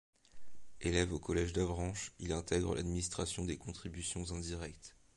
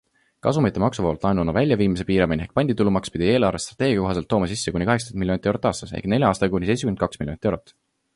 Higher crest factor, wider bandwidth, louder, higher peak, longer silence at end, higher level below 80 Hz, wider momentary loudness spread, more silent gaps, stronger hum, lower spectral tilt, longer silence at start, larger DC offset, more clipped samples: about the same, 22 dB vs 18 dB; about the same, 11.5 kHz vs 11.5 kHz; second, -38 LUFS vs -22 LUFS; second, -16 dBFS vs -4 dBFS; second, 0 s vs 0.55 s; second, -48 dBFS vs -42 dBFS; first, 9 LU vs 6 LU; neither; neither; second, -4.5 dB/octave vs -6 dB/octave; second, 0.15 s vs 0.45 s; neither; neither